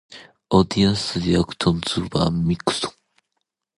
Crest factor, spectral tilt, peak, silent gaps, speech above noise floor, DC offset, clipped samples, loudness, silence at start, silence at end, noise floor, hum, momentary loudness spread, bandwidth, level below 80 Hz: 20 dB; -5.5 dB/octave; -2 dBFS; none; 58 dB; under 0.1%; under 0.1%; -21 LUFS; 0.1 s; 0.85 s; -78 dBFS; none; 5 LU; 11.5 kHz; -42 dBFS